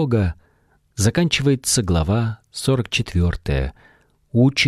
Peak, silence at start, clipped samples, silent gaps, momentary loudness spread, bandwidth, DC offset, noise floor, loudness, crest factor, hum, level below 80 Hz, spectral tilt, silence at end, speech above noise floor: -4 dBFS; 0 s; under 0.1%; none; 8 LU; 15 kHz; under 0.1%; -60 dBFS; -20 LUFS; 16 dB; none; -34 dBFS; -5 dB/octave; 0 s; 41 dB